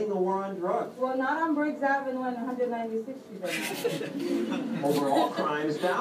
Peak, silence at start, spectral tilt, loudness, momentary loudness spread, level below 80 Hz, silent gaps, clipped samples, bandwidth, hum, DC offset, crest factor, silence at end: -12 dBFS; 0 s; -5 dB/octave; -29 LUFS; 7 LU; -82 dBFS; none; under 0.1%; 15.5 kHz; none; under 0.1%; 16 dB; 0 s